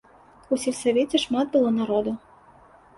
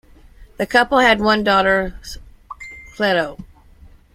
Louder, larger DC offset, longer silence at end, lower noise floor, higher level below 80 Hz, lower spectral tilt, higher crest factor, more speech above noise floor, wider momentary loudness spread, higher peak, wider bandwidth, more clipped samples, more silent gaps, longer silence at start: second, -24 LUFS vs -16 LUFS; neither; about the same, 0.8 s vs 0.7 s; first, -52 dBFS vs -46 dBFS; second, -60 dBFS vs -42 dBFS; about the same, -4.5 dB/octave vs -4.5 dB/octave; about the same, 16 dB vs 18 dB; about the same, 30 dB vs 29 dB; second, 7 LU vs 22 LU; second, -8 dBFS vs -2 dBFS; second, 11.5 kHz vs 16 kHz; neither; neither; about the same, 0.5 s vs 0.4 s